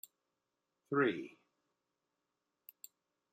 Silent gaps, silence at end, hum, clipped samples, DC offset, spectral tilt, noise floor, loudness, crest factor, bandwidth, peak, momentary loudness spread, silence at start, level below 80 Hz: none; 2.05 s; none; under 0.1%; under 0.1%; -6 dB/octave; -88 dBFS; -36 LUFS; 22 dB; 16 kHz; -20 dBFS; 24 LU; 0.9 s; under -90 dBFS